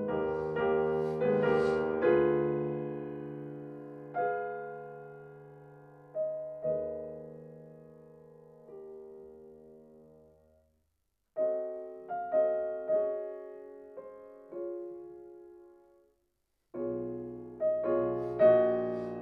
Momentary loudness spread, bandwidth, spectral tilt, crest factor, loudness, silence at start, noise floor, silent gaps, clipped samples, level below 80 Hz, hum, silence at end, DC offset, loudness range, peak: 23 LU; 6 kHz; -9 dB/octave; 22 dB; -32 LUFS; 0 s; -81 dBFS; none; under 0.1%; -66 dBFS; none; 0 s; under 0.1%; 16 LU; -12 dBFS